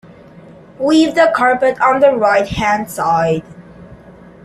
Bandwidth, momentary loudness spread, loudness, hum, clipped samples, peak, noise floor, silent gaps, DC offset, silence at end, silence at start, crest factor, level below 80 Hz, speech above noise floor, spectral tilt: 13.5 kHz; 6 LU; -13 LUFS; none; under 0.1%; 0 dBFS; -39 dBFS; none; under 0.1%; 0.35 s; 0.8 s; 14 dB; -44 dBFS; 26 dB; -5.5 dB/octave